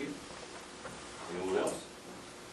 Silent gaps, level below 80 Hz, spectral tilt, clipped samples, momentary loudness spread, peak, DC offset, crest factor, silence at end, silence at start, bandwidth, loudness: none; -66 dBFS; -3.5 dB/octave; under 0.1%; 14 LU; -20 dBFS; under 0.1%; 20 dB; 0 s; 0 s; 13 kHz; -40 LUFS